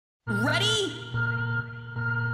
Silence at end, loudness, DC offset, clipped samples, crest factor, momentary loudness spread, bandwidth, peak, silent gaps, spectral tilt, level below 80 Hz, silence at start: 0 s; -27 LUFS; under 0.1%; under 0.1%; 14 dB; 9 LU; 14.5 kHz; -14 dBFS; none; -4 dB/octave; -56 dBFS; 0.25 s